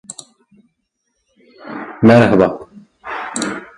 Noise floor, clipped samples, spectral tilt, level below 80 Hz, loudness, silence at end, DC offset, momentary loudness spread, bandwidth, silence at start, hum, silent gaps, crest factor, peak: -70 dBFS; under 0.1%; -6 dB/octave; -50 dBFS; -13 LUFS; 0.15 s; under 0.1%; 24 LU; 11.5 kHz; 0.1 s; none; none; 18 dB; 0 dBFS